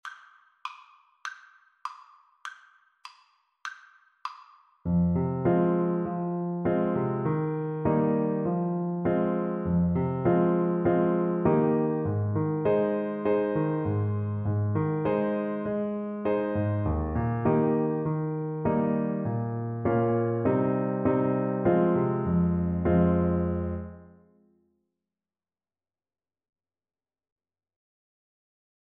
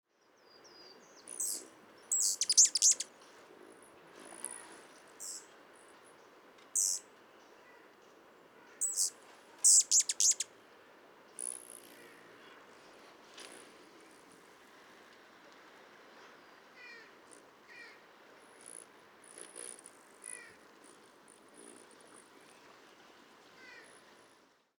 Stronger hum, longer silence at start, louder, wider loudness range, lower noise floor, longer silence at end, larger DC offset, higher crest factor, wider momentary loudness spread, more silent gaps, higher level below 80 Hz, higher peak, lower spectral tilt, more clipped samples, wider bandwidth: neither; second, 0.05 s vs 1.3 s; about the same, -27 LUFS vs -29 LUFS; second, 12 LU vs 25 LU; first, under -90 dBFS vs -67 dBFS; first, 4.9 s vs 1 s; neither; second, 16 dB vs 26 dB; second, 17 LU vs 31 LU; neither; first, -48 dBFS vs under -90 dBFS; about the same, -12 dBFS vs -14 dBFS; first, -10 dB/octave vs 2.5 dB/octave; neither; second, 6.6 kHz vs over 20 kHz